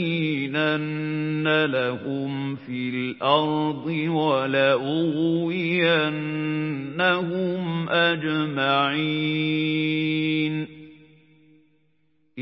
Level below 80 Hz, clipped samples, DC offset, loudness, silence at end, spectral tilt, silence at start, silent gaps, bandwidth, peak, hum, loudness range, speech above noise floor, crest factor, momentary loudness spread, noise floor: -68 dBFS; under 0.1%; under 0.1%; -23 LUFS; 0 s; -10.5 dB/octave; 0 s; none; 5.8 kHz; -6 dBFS; none; 2 LU; 45 dB; 18 dB; 7 LU; -69 dBFS